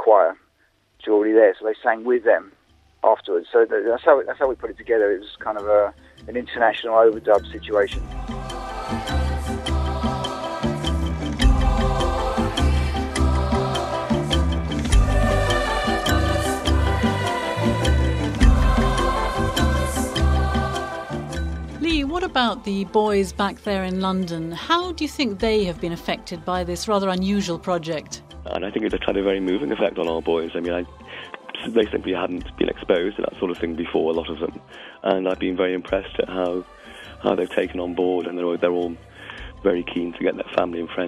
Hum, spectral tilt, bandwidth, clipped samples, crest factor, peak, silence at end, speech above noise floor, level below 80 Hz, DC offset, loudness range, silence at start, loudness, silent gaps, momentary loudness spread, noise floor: none; -6 dB/octave; 13.5 kHz; under 0.1%; 20 dB; -2 dBFS; 0 s; 41 dB; -28 dBFS; under 0.1%; 4 LU; 0 s; -22 LUFS; none; 10 LU; -63 dBFS